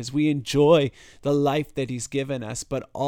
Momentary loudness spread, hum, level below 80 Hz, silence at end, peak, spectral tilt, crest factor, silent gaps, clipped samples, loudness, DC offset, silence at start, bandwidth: 12 LU; none; -52 dBFS; 0 s; -6 dBFS; -5.5 dB/octave; 18 dB; none; under 0.1%; -24 LUFS; under 0.1%; 0 s; 17.5 kHz